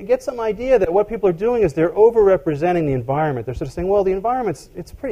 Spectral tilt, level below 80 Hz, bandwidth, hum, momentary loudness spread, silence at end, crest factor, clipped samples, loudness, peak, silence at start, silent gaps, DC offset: -8 dB/octave; -40 dBFS; 12.5 kHz; none; 11 LU; 0 s; 16 dB; under 0.1%; -18 LUFS; -2 dBFS; 0 s; none; under 0.1%